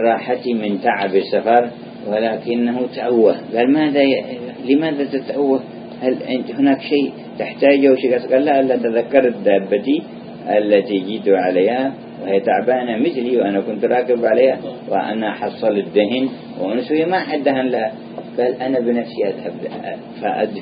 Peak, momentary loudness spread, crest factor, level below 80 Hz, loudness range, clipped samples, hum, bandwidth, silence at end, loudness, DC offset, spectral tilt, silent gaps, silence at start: 0 dBFS; 10 LU; 18 dB; -66 dBFS; 3 LU; under 0.1%; none; 5.2 kHz; 0 s; -18 LUFS; under 0.1%; -10 dB/octave; none; 0 s